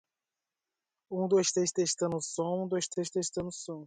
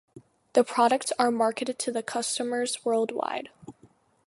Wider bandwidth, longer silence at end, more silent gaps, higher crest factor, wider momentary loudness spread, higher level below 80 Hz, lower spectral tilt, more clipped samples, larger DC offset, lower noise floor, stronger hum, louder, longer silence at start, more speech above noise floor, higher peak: second, 9.6 kHz vs 11.5 kHz; second, 0 s vs 0.55 s; neither; about the same, 16 dB vs 20 dB; about the same, 9 LU vs 8 LU; first, -70 dBFS vs -76 dBFS; first, -4 dB/octave vs -2.5 dB/octave; neither; neither; first, under -90 dBFS vs -60 dBFS; neither; second, -31 LUFS vs -27 LUFS; first, 1.1 s vs 0.15 s; first, over 59 dB vs 34 dB; second, -16 dBFS vs -8 dBFS